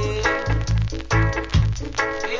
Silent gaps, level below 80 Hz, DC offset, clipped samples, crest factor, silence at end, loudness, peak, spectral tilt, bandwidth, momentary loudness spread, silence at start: none; -28 dBFS; under 0.1%; under 0.1%; 16 dB; 0 s; -22 LUFS; -6 dBFS; -5.5 dB/octave; 7.6 kHz; 3 LU; 0 s